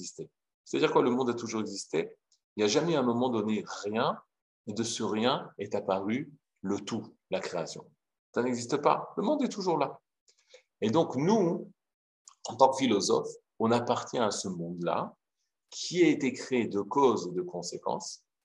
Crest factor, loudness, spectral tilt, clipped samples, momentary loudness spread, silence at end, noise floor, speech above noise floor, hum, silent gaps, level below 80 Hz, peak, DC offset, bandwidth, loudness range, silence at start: 24 dB; -30 LUFS; -5 dB/octave; under 0.1%; 16 LU; 0.3 s; -85 dBFS; 55 dB; none; 0.54-0.64 s, 2.44-2.56 s, 4.42-4.64 s, 8.19-8.33 s, 10.21-10.27 s, 11.94-12.25 s; -80 dBFS; -6 dBFS; under 0.1%; 11 kHz; 4 LU; 0 s